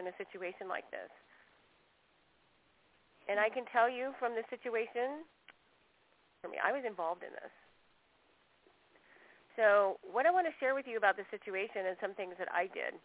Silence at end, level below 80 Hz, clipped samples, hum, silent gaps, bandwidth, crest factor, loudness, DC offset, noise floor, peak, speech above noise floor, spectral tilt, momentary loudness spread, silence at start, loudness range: 0.05 s; -84 dBFS; under 0.1%; none; none; 4 kHz; 22 dB; -35 LUFS; under 0.1%; -72 dBFS; -14 dBFS; 36 dB; -1 dB/octave; 17 LU; 0 s; 9 LU